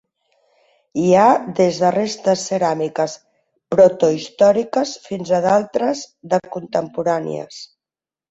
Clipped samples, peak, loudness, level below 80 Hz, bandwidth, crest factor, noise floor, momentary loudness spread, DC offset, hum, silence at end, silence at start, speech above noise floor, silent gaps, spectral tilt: under 0.1%; -2 dBFS; -18 LUFS; -60 dBFS; 8 kHz; 16 dB; under -90 dBFS; 14 LU; under 0.1%; none; 0.65 s; 0.95 s; over 73 dB; none; -5.5 dB/octave